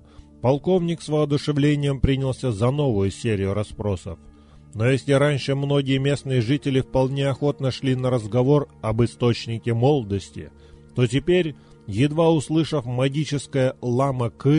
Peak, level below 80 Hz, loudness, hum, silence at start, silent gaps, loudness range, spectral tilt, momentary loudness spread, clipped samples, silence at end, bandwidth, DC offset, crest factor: -6 dBFS; -42 dBFS; -22 LUFS; none; 0.45 s; none; 2 LU; -7 dB/octave; 8 LU; under 0.1%; 0 s; 11 kHz; under 0.1%; 16 dB